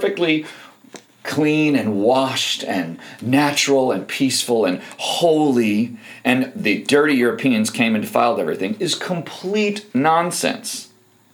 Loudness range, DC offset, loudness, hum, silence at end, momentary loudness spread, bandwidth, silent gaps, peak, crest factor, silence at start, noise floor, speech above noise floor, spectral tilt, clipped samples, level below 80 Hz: 2 LU; under 0.1%; -19 LUFS; none; 0.5 s; 9 LU; over 20 kHz; none; -2 dBFS; 18 dB; 0 s; -44 dBFS; 25 dB; -4 dB/octave; under 0.1%; -76 dBFS